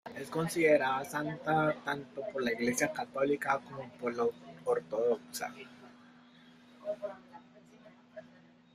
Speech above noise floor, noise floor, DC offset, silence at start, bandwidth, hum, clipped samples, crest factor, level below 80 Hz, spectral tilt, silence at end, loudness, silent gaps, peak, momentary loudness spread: 27 dB; -60 dBFS; under 0.1%; 0.05 s; 15.5 kHz; none; under 0.1%; 20 dB; -74 dBFS; -4.5 dB/octave; 0.5 s; -33 LUFS; none; -14 dBFS; 19 LU